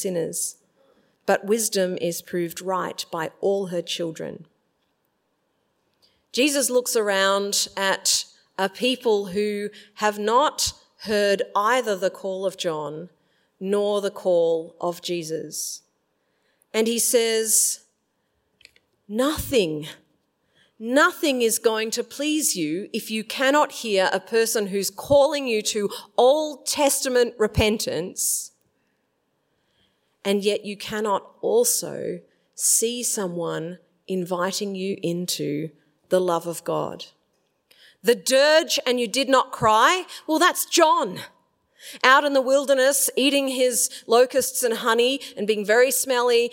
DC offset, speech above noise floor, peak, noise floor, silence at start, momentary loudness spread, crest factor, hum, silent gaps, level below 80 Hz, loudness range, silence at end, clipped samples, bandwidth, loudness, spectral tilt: under 0.1%; 50 dB; 0 dBFS; -72 dBFS; 0 s; 11 LU; 22 dB; none; none; -52 dBFS; 7 LU; 0 s; under 0.1%; 16.5 kHz; -22 LUFS; -2.5 dB/octave